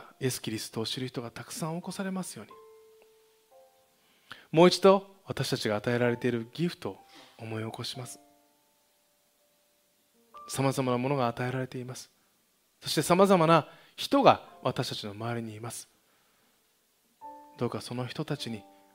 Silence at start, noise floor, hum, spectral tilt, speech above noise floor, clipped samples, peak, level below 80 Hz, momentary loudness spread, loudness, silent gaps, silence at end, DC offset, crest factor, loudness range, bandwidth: 0 s; -70 dBFS; none; -5 dB/octave; 41 dB; under 0.1%; -4 dBFS; -70 dBFS; 22 LU; -29 LUFS; none; 0.35 s; under 0.1%; 26 dB; 13 LU; 16 kHz